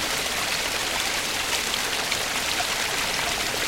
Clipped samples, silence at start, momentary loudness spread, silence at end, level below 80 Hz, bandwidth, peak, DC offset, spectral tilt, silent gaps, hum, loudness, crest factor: under 0.1%; 0 s; 1 LU; 0 s; -48 dBFS; 16.5 kHz; -8 dBFS; under 0.1%; -0.5 dB/octave; none; none; -24 LUFS; 18 dB